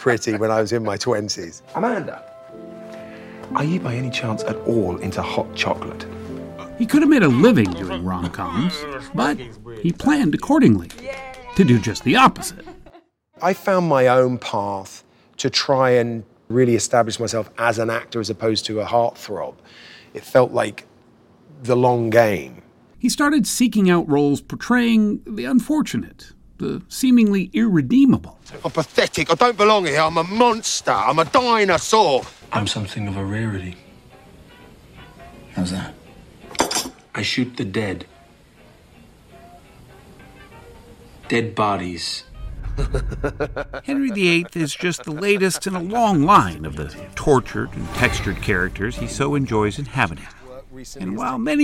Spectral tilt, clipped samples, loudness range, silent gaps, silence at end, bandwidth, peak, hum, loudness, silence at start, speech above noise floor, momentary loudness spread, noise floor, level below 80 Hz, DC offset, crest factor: -5 dB/octave; under 0.1%; 9 LU; none; 0 s; 16.5 kHz; -2 dBFS; none; -19 LUFS; 0 s; 33 dB; 17 LU; -52 dBFS; -40 dBFS; under 0.1%; 18 dB